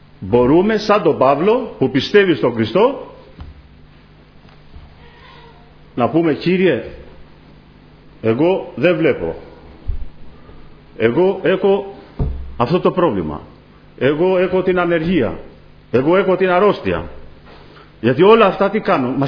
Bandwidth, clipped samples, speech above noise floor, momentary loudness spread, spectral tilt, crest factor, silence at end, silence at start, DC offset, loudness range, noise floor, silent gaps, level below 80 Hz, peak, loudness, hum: 5.4 kHz; under 0.1%; 30 dB; 16 LU; -8 dB/octave; 16 dB; 0 s; 0.2 s; under 0.1%; 6 LU; -45 dBFS; none; -36 dBFS; 0 dBFS; -15 LUFS; none